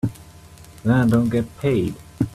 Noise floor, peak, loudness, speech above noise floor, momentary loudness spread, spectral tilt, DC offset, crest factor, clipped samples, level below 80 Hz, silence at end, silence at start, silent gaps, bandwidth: -44 dBFS; -4 dBFS; -21 LUFS; 25 dB; 11 LU; -8 dB/octave; under 0.1%; 16 dB; under 0.1%; -46 dBFS; 0 s; 0.05 s; none; 14 kHz